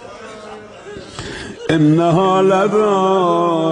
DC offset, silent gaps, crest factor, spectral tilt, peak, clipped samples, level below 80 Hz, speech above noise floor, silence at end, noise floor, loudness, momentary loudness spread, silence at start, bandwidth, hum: under 0.1%; none; 14 dB; -7 dB/octave; -2 dBFS; under 0.1%; -48 dBFS; 21 dB; 0 s; -34 dBFS; -14 LUFS; 21 LU; 0 s; 10 kHz; none